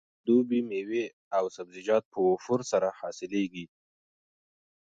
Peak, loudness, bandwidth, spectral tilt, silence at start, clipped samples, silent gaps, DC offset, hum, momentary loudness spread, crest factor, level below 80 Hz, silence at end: -14 dBFS; -29 LUFS; 7.8 kHz; -5.5 dB/octave; 0.25 s; under 0.1%; 1.13-1.31 s, 2.05-2.11 s; under 0.1%; none; 11 LU; 16 dB; -74 dBFS; 1.2 s